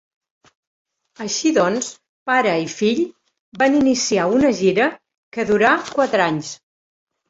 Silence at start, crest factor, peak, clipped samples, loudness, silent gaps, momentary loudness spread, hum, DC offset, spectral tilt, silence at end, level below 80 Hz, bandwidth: 1.2 s; 18 dB; -2 dBFS; under 0.1%; -18 LUFS; 2.09-2.26 s, 3.40-3.52 s, 5.17-5.32 s; 13 LU; none; under 0.1%; -4 dB/octave; 0.75 s; -56 dBFS; 8 kHz